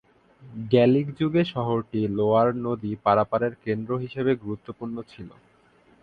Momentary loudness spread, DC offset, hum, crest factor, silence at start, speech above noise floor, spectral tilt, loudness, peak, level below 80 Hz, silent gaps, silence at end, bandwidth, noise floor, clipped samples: 16 LU; under 0.1%; none; 20 dB; 0.4 s; 35 dB; -9.5 dB/octave; -24 LUFS; -6 dBFS; -58 dBFS; none; 0.75 s; 5.2 kHz; -59 dBFS; under 0.1%